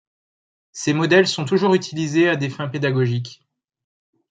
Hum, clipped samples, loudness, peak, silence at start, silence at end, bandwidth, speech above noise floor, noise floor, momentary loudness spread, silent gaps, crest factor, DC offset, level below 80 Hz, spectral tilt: none; under 0.1%; -19 LUFS; -2 dBFS; 0.75 s; 0.95 s; 9.4 kHz; over 71 dB; under -90 dBFS; 11 LU; none; 18 dB; under 0.1%; -66 dBFS; -5.5 dB/octave